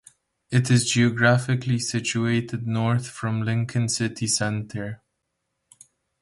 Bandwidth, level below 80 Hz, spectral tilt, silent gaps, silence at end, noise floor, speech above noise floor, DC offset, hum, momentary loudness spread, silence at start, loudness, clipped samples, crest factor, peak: 11.5 kHz; -58 dBFS; -4.5 dB/octave; none; 1.25 s; -78 dBFS; 55 dB; under 0.1%; none; 10 LU; 0.5 s; -23 LUFS; under 0.1%; 20 dB; -6 dBFS